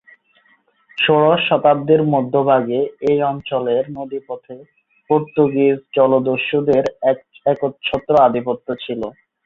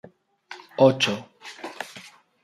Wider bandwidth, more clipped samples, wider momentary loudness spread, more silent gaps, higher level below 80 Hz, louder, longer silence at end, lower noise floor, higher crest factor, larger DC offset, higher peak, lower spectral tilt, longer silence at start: second, 6.6 kHz vs 14 kHz; neither; second, 12 LU vs 25 LU; neither; first, -56 dBFS vs -70 dBFS; first, -17 LUFS vs -21 LUFS; about the same, 0.35 s vs 0.45 s; first, -58 dBFS vs -48 dBFS; second, 16 dB vs 22 dB; neither; about the same, -2 dBFS vs -4 dBFS; first, -8 dB/octave vs -5 dB/octave; first, 0.95 s vs 0.5 s